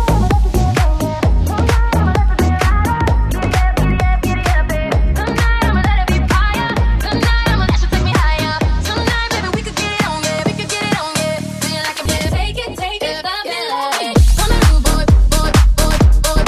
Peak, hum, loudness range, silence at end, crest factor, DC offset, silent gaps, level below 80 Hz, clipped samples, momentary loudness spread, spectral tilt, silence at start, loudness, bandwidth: 0 dBFS; none; 4 LU; 0 s; 12 dB; under 0.1%; none; -16 dBFS; under 0.1%; 6 LU; -5 dB/octave; 0 s; -15 LUFS; 15.5 kHz